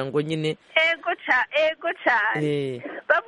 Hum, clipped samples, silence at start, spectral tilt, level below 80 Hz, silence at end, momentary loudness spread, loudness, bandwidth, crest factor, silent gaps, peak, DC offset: none; under 0.1%; 0 s; -5.5 dB/octave; -68 dBFS; 0.05 s; 7 LU; -23 LUFS; 10.5 kHz; 18 dB; none; -4 dBFS; under 0.1%